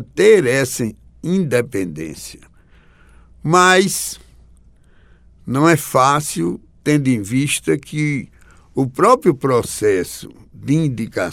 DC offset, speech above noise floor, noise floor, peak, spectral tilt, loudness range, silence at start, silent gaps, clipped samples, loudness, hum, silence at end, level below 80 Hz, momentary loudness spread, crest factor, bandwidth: under 0.1%; 32 dB; -48 dBFS; 0 dBFS; -5 dB/octave; 2 LU; 0 s; none; under 0.1%; -17 LUFS; none; 0 s; -48 dBFS; 16 LU; 18 dB; 16.5 kHz